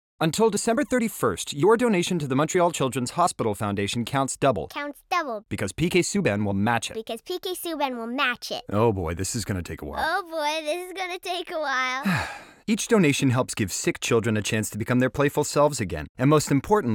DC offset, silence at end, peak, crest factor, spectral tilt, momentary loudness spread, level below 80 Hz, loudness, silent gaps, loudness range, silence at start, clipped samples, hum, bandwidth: under 0.1%; 0 s; -8 dBFS; 18 dB; -4.5 dB/octave; 10 LU; -50 dBFS; -25 LUFS; 16.09-16.15 s; 4 LU; 0.2 s; under 0.1%; none; 18 kHz